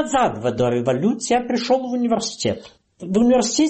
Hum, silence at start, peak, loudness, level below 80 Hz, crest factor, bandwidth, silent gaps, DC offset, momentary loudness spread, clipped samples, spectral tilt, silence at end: none; 0 s; -8 dBFS; -20 LUFS; -50 dBFS; 12 dB; 8.8 kHz; none; under 0.1%; 8 LU; under 0.1%; -4.5 dB/octave; 0 s